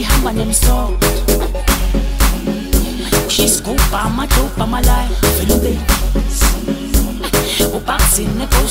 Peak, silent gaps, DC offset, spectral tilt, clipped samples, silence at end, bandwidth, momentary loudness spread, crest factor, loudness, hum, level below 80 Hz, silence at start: 0 dBFS; none; 0.3%; -4 dB/octave; under 0.1%; 0 s; 16.5 kHz; 5 LU; 14 dB; -15 LUFS; none; -16 dBFS; 0 s